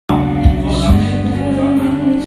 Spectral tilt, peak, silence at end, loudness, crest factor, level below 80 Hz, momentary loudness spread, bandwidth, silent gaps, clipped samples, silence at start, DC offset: -7.5 dB/octave; 0 dBFS; 0 s; -14 LUFS; 14 dB; -20 dBFS; 3 LU; 14 kHz; none; under 0.1%; 0.1 s; under 0.1%